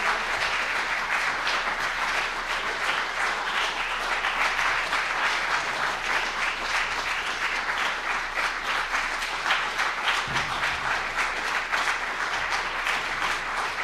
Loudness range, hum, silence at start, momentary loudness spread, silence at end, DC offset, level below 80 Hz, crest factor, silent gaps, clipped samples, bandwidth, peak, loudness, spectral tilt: 1 LU; none; 0 s; 3 LU; 0 s; under 0.1%; -48 dBFS; 18 dB; none; under 0.1%; 15 kHz; -10 dBFS; -25 LUFS; -1 dB/octave